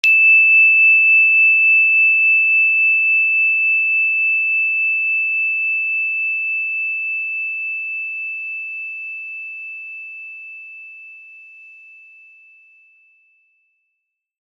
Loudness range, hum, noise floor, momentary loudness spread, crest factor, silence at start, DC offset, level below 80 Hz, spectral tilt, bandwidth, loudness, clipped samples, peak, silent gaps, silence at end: 21 LU; none; -76 dBFS; 20 LU; 16 dB; 0.05 s; under 0.1%; under -90 dBFS; 5.5 dB/octave; 6.8 kHz; -12 LUFS; under 0.1%; -2 dBFS; none; 3.05 s